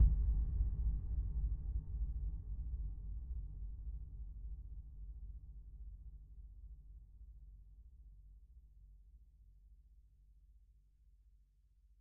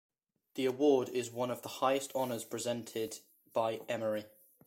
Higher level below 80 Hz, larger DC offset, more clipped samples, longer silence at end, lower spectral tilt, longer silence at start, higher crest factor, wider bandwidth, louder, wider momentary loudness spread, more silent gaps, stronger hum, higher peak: first, -42 dBFS vs -82 dBFS; neither; neither; first, 0.7 s vs 0.4 s; first, -14.5 dB/octave vs -4.5 dB/octave; second, 0 s vs 0.55 s; first, 24 dB vs 18 dB; second, 1.1 kHz vs 16.5 kHz; second, -45 LUFS vs -35 LUFS; first, 24 LU vs 11 LU; neither; neither; about the same, -18 dBFS vs -18 dBFS